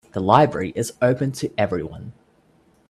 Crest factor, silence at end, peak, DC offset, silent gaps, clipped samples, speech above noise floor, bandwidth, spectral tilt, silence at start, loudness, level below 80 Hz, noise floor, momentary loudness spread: 22 dB; 0.8 s; 0 dBFS; under 0.1%; none; under 0.1%; 38 dB; 15 kHz; -6 dB/octave; 0.15 s; -20 LUFS; -54 dBFS; -58 dBFS; 18 LU